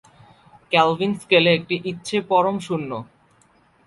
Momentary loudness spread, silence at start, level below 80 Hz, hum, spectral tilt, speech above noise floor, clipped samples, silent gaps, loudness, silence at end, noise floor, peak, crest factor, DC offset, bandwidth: 11 LU; 0.7 s; -62 dBFS; none; -5 dB/octave; 38 dB; under 0.1%; none; -20 LUFS; 0.8 s; -58 dBFS; -2 dBFS; 20 dB; under 0.1%; 11.5 kHz